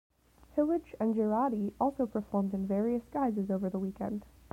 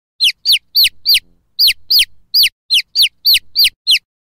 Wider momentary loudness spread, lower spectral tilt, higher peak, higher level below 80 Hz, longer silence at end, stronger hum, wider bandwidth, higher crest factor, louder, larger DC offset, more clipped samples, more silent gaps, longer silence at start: first, 7 LU vs 4 LU; first, -10 dB/octave vs 5 dB/octave; second, -16 dBFS vs -4 dBFS; second, -60 dBFS vs -50 dBFS; about the same, 0.25 s vs 0.3 s; neither; about the same, 15.5 kHz vs 16.5 kHz; about the same, 16 dB vs 12 dB; second, -33 LUFS vs -11 LUFS; neither; neither; second, none vs 2.52-2.69 s, 3.76-3.85 s; first, 0.55 s vs 0.2 s